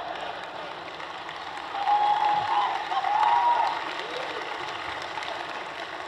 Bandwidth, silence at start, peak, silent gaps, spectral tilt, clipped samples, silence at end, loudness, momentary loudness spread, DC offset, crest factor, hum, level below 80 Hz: 11.5 kHz; 0 s; -12 dBFS; none; -2.5 dB/octave; under 0.1%; 0 s; -27 LUFS; 13 LU; under 0.1%; 16 dB; none; -66 dBFS